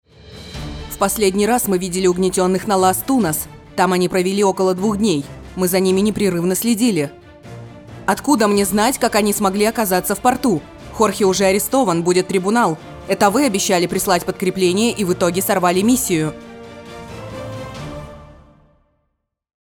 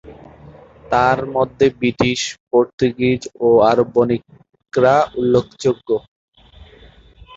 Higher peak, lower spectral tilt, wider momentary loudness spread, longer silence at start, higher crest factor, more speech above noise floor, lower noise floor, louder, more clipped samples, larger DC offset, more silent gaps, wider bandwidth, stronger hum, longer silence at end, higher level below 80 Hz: about the same, -2 dBFS vs -2 dBFS; about the same, -4.5 dB/octave vs -5.5 dB/octave; first, 17 LU vs 8 LU; first, 0.25 s vs 0.05 s; about the same, 16 dB vs 16 dB; first, 56 dB vs 29 dB; first, -72 dBFS vs -46 dBFS; about the same, -17 LUFS vs -17 LUFS; neither; neither; second, none vs 2.40-2.47 s, 2.73-2.78 s, 6.08-6.32 s; first, over 20 kHz vs 8 kHz; neither; first, 1.45 s vs 0 s; about the same, -44 dBFS vs -46 dBFS